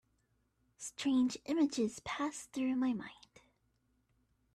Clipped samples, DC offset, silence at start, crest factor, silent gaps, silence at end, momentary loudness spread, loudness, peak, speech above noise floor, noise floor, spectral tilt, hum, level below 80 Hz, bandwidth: under 0.1%; under 0.1%; 0.8 s; 16 dB; none; 1.4 s; 12 LU; -36 LUFS; -22 dBFS; 42 dB; -77 dBFS; -4 dB/octave; none; -74 dBFS; 12.5 kHz